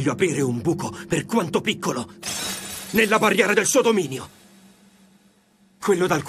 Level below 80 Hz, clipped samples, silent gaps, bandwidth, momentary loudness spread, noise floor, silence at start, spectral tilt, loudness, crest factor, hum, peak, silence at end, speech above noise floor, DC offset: -58 dBFS; under 0.1%; none; 15 kHz; 12 LU; -58 dBFS; 0 s; -4 dB/octave; -22 LUFS; 20 dB; none; -2 dBFS; 0 s; 37 dB; under 0.1%